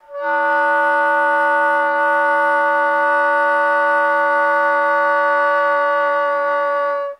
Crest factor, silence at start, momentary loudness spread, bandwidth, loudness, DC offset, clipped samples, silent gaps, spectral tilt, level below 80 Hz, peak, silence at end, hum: 10 dB; 0.1 s; 3 LU; 10.5 kHz; -16 LUFS; under 0.1%; under 0.1%; none; -2 dB/octave; -78 dBFS; -6 dBFS; 0.05 s; none